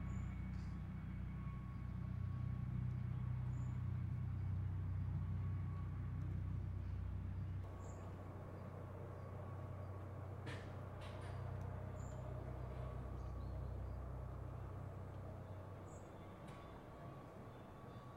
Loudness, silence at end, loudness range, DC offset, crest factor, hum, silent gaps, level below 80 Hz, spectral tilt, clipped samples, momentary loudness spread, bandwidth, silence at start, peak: -48 LUFS; 0 s; 7 LU; under 0.1%; 14 dB; none; none; -54 dBFS; -8.5 dB/octave; under 0.1%; 11 LU; 9.4 kHz; 0 s; -34 dBFS